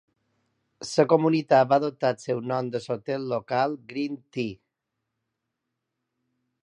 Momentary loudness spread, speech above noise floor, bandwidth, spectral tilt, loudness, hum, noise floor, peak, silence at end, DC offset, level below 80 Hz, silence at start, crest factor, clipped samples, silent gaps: 12 LU; 58 dB; 11 kHz; -6 dB/octave; -25 LUFS; none; -82 dBFS; -6 dBFS; 2.1 s; under 0.1%; -72 dBFS; 0.8 s; 22 dB; under 0.1%; none